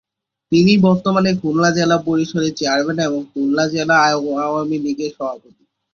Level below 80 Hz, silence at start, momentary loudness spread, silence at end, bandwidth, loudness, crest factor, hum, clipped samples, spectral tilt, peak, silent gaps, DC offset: -54 dBFS; 0.5 s; 9 LU; 0.55 s; 7.2 kHz; -17 LUFS; 16 dB; none; under 0.1%; -5.5 dB/octave; -2 dBFS; none; under 0.1%